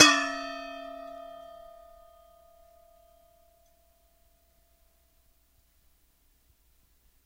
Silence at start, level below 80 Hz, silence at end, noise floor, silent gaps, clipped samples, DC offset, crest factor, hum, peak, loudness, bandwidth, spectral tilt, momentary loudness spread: 0 s; -66 dBFS; 5.9 s; -66 dBFS; none; under 0.1%; under 0.1%; 32 dB; none; 0 dBFS; -28 LUFS; 16 kHz; 0 dB/octave; 25 LU